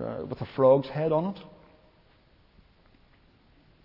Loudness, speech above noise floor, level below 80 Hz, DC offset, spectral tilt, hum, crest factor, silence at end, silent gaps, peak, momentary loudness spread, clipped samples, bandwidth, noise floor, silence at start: -26 LUFS; 36 dB; -62 dBFS; under 0.1%; -10.5 dB/octave; none; 20 dB; 2.4 s; none; -8 dBFS; 14 LU; under 0.1%; 5.6 kHz; -61 dBFS; 0 s